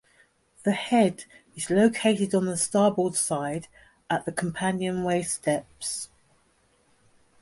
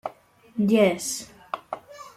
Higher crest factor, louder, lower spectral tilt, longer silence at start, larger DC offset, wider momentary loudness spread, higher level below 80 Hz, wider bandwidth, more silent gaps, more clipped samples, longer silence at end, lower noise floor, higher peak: about the same, 20 dB vs 20 dB; about the same, -26 LUFS vs -24 LUFS; about the same, -4.5 dB/octave vs -4.5 dB/octave; first, 0.65 s vs 0.05 s; neither; second, 11 LU vs 18 LU; about the same, -64 dBFS vs -66 dBFS; second, 12 kHz vs 15 kHz; neither; neither; first, 1.35 s vs 0.05 s; first, -65 dBFS vs -50 dBFS; about the same, -8 dBFS vs -6 dBFS